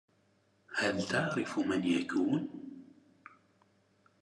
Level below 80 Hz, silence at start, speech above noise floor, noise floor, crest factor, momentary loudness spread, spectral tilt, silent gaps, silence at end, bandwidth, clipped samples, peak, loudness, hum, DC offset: -84 dBFS; 0.7 s; 39 dB; -71 dBFS; 20 dB; 15 LU; -5 dB/octave; none; 1.4 s; 11.5 kHz; under 0.1%; -16 dBFS; -33 LUFS; none; under 0.1%